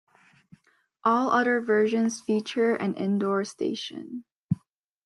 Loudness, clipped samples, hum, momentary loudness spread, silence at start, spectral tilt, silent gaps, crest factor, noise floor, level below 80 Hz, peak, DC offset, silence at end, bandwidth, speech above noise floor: -26 LUFS; under 0.1%; none; 12 LU; 1.05 s; -5.5 dB/octave; 4.35-4.49 s; 16 dB; -62 dBFS; -70 dBFS; -10 dBFS; under 0.1%; 0.5 s; 11.5 kHz; 37 dB